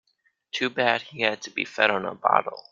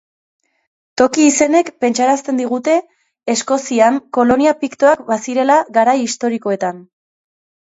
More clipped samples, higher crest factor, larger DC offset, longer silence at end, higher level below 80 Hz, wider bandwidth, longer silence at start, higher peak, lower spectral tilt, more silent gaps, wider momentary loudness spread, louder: neither; first, 24 dB vs 16 dB; neither; second, 0.1 s vs 0.85 s; second, -72 dBFS vs -58 dBFS; about the same, 7.6 kHz vs 8 kHz; second, 0.55 s vs 0.95 s; about the same, -2 dBFS vs 0 dBFS; about the same, -3.5 dB/octave vs -3.5 dB/octave; neither; about the same, 7 LU vs 7 LU; second, -24 LUFS vs -15 LUFS